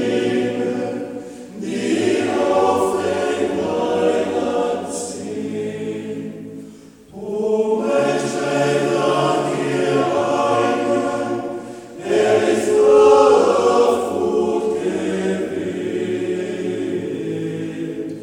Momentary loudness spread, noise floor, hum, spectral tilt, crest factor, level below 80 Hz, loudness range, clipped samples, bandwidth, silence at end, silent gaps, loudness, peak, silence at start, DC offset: 12 LU; -41 dBFS; none; -5 dB/octave; 18 dB; -58 dBFS; 8 LU; under 0.1%; 13.5 kHz; 0 s; none; -19 LUFS; 0 dBFS; 0 s; under 0.1%